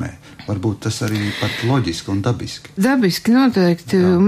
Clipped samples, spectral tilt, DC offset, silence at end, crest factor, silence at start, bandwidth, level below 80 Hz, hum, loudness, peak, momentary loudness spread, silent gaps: under 0.1%; -6 dB/octave; under 0.1%; 0 s; 12 dB; 0 s; 15.5 kHz; -48 dBFS; none; -18 LUFS; -4 dBFS; 11 LU; none